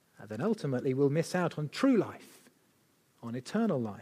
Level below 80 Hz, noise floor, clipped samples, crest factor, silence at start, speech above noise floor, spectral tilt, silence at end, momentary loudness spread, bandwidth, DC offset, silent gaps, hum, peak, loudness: -78 dBFS; -69 dBFS; under 0.1%; 18 dB; 0.2 s; 38 dB; -7 dB/octave; 0 s; 14 LU; 15 kHz; under 0.1%; none; none; -16 dBFS; -31 LUFS